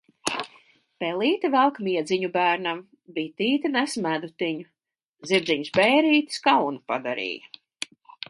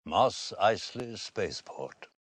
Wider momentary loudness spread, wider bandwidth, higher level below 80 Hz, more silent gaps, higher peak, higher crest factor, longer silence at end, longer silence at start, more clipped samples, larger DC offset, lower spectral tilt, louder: about the same, 16 LU vs 15 LU; about the same, 11.5 kHz vs 10.5 kHz; second, -72 dBFS vs -64 dBFS; first, 5.06-5.13 s vs none; first, -6 dBFS vs -10 dBFS; about the same, 20 dB vs 22 dB; first, 0.85 s vs 0.15 s; first, 0.25 s vs 0.05 s; neither; neither; about the same, -4 dB/octave vs -3.5 dB/octave; first, -24 LUFS vs -31 LUFS